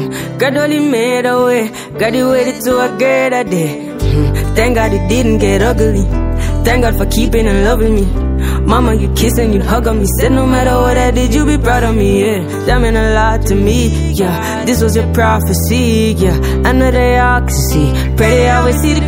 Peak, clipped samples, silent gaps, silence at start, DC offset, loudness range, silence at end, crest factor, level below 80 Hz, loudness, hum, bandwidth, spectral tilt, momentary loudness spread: 0 dBFS; under 0.1%; none; 0 s; under 0.1%; 2 LU; 0 s; 10 dB; -16 dBFS; -12 LUFS; none; 16.5 kHz; -5.5 dB/octave; 4 LU